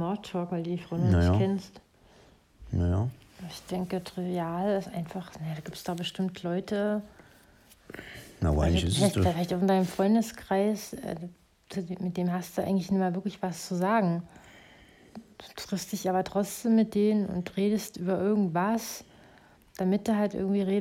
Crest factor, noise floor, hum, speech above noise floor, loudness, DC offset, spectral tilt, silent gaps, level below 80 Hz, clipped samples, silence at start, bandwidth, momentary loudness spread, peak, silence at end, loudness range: 18 dB; -58 dBFS; none; 30 dB; -29 LUFS; under 0.1%; -6.5 dB/octave; none; -48 dBFS; under 0.1%; 0 s; 16 kHz; 16 LU; -10 dBFS; 0 s; 6 LU